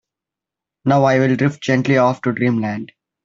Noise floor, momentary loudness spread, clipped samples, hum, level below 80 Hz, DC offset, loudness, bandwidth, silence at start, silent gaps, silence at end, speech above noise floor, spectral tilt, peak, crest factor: -86 dBFS; 10 LU; under 0.1%; none; -58 dBFS; under 0.1%; -17 LUFS; 7.6 kHz; 0.85 s; none; 0.4 s; 70 dB; -7 dB/octave; -2 dBFS; 16 dB